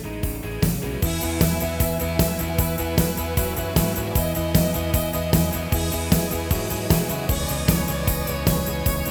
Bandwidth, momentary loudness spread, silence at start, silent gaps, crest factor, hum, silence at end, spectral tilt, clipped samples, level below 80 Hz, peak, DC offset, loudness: over 20 kHz; 3 LU; 0 s; none; 20 dB; none; 0 s; -5 dB/octave; under 0.1%; -30 dBFS; -2 dBFS; under 0.1%; -23 LUFS